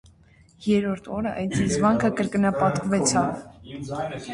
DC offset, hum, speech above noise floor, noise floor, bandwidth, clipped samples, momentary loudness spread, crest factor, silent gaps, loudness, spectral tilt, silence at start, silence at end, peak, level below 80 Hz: under 0.1%; none; 31 dB; -55 dBFS; 11.5 kHz; under 0.1%; 12 LU; 16 dB; none; -24 LUFS; -5 dB/octave; 0.6 s; 0 s; -8 dBFS; -50 dBFS